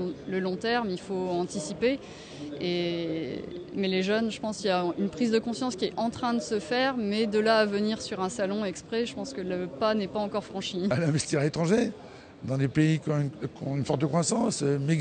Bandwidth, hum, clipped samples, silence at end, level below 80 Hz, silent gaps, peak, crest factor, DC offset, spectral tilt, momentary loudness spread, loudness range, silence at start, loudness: 9.6 kHz; none; under 0.1%; 0 s; -60 dBFS; none; -12 dBFS; 16 dB; under 0.1%; -5.5 dB/octave; 8 LU; 3 LU; 0 s; -28 LUFS